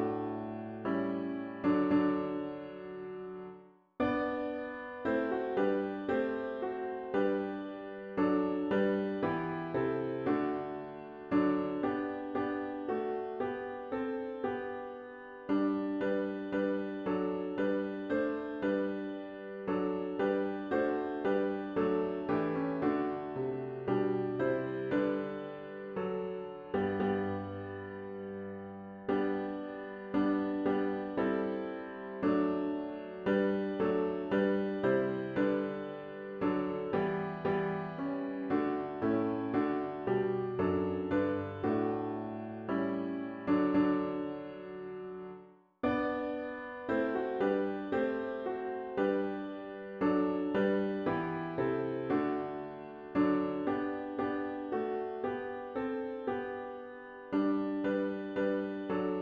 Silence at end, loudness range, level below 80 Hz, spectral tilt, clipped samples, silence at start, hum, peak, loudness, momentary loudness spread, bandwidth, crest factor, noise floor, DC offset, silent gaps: 0 s; 4 LU; -66 dBFS; -9 dB/octave; under 0.1%; 0 s; none; -18 dBFS; -34 LUFS; 11 LU; 5 kHz; 16 dB; -55 dBFS; under 0.1%; none